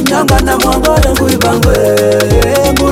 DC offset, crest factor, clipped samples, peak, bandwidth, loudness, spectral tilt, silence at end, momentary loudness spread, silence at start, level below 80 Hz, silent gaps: under 0.1%; 8 dB; under 0.1%; 0 dBFS; 17 kHz; -9 LUFS; -5 dB/octave; 0 s; 1 LU; 0 s; -18 dBFS; none